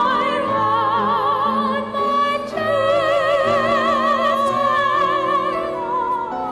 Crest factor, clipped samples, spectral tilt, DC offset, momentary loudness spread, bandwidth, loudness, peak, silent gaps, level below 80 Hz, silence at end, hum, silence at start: 10 dB; under 0.1%; -5 dB/octave; under 0.1%; 5 LU; 13 kHz; -18 LUFS; -8 dBFS; none; -52 dBFS; 0 s; none; 0 s